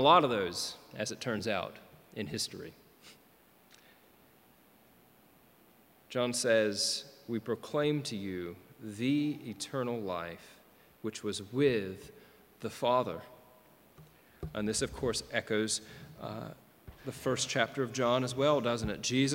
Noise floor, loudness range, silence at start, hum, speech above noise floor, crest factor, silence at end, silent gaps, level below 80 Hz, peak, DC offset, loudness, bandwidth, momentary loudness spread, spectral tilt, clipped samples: -63 dBFS; 7 LU; 0 s; none; 31 dB; 24 dB; 0 s; none; -62 dBFS; -10 dBFS; under 0.1%; -33 LUFS; 17 kHz; 17 LU; -4 dB/octave; under 0.1%